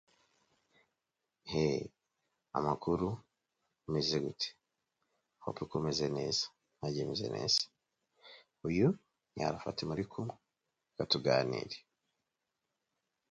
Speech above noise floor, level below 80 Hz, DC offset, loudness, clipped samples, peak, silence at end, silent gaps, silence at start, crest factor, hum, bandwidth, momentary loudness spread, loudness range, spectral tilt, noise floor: 53 dB; -64 dBFS; under 0.1%; -36 LUFS; under 0.1%; -14 dBFS; 1.5 s; none; 1.45 s; 24 dB; none; 9 kHz; 14 LU; 3 LU; -5 dB/octave; -88 dBFS